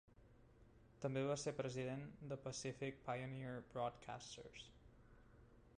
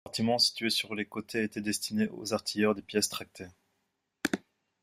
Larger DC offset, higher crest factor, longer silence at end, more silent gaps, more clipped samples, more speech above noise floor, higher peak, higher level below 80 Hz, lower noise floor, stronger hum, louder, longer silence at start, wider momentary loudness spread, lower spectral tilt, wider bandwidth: neither; about the same, 18 dB vs 22 dB; second, 0 s vs 0.45 s; neither; neither; second, 21 dB vs 49 dB; second, -32 dBFS vs -10 dBFS; about the same, -72 dBFS vs -70 dBFS; second, -68 dBFS vs -80 dBFS; neither; second, -48 LUFS vs -31 LUFS; first, 0.2 s vs 0.05 s; first, 25 LU vs 13 LU; first, -5 dB/octave vs -3 dB/octave; second, 10.5 kHz vs 16 kHz